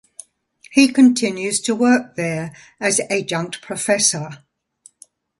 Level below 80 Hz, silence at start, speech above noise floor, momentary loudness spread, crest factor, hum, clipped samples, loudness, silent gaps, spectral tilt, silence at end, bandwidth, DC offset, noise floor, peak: -64 dBFS; 0.7 s; 35 dB; 14 LU; 20 dB; none; under 0.1%; -18 LUFS; none; -3.5 dB/octave; 1.05 s; 11.5 kHz; under 0.1%; -53 dBFS; 0 dBFS